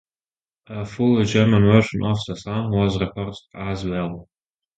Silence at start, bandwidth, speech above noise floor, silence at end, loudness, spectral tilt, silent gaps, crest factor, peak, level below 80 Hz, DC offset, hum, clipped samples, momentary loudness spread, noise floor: 0.7 s; 8 kHz; over 70 dB; 0.55 s; -20 LUFS; -7 dB/octave; none; 20 dB; 0 dBFS; -44 dBFS; under 0.1%; none; under 0.1%; 16 LU; under -90 dBFS